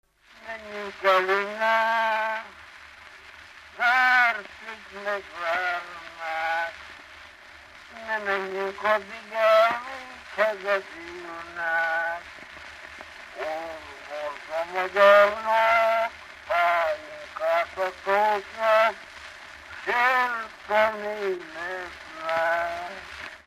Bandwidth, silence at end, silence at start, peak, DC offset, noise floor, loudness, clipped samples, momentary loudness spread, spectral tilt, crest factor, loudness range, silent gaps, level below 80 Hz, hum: 15 kHz; 0.1 s; 0.4 s; -6 dBFS; under 0.1%; -48 dBFS; -24 LUFS; under 0.1%; 21 LU; -3 dB/octave; 20 dB; 9 LU; none; -62 dBFS; none